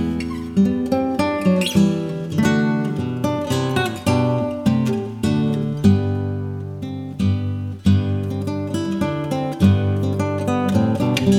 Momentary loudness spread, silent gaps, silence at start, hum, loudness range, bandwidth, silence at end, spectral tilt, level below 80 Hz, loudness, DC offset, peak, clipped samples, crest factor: 7 LU; none; 0 s; none; 2 LU; 14.5 kHz; 0 s; -7 dB/octave; -46 dBFS; -20 LUFS; under 0.1%; -2 dBFS; under 0.1%; 16 dB